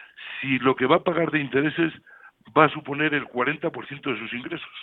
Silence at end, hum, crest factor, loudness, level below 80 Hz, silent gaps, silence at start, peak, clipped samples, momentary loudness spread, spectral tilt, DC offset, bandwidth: 0 s; none; 24 dB; -24 LUFS; -66 dBFS; none; 0 s; -2 dBFS; under 0.1%; 12 LU; -9 dB/octave; under 0.1%; 4.1 kHz